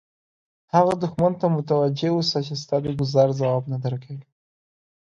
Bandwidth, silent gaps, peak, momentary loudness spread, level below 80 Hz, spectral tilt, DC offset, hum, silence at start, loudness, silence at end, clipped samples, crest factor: 9.6 kHz; none; -4 dBFS; 9 LU; -58 dBFS; -7 dB/octave; under 0.1%; none; 0.75 s; -22 LUFS; 0.8 s; under 0.1%; 20 dB